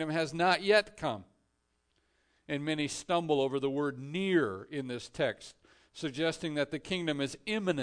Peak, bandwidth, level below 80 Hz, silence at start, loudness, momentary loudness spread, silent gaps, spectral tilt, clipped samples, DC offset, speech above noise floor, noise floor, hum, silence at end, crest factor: -14 dBFS; 10 kHz; -66 dBFS; 0 s; -32 LUFS; 12 LU; none; -5 dB/octave; under 0.1%; under 0.1%; 45 dB; -77 dBFS; none; 0 s; 18 dB